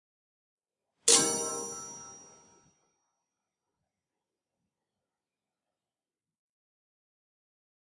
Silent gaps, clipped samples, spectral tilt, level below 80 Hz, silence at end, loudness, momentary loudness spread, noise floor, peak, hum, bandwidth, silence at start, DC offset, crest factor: none; under 0.1%; 0 dB/octave; -84 dBFS; 5.7 s; -25 LUFS; 23 LU; under -90 dBFS; -6 dBFS; none; 11.5 kHz; 1.05 s; under 0.1%; 32 dB